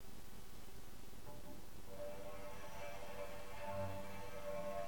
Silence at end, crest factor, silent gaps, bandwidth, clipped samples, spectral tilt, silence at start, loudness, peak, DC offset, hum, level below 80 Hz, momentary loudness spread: 0 s; 16 dB; none; 19.5 kHz; under 0.1%; -5 dB/octave; 0 s; -51 LUFS; -32 dBFS; 0.6%; none; -60 dBFS; 11 LU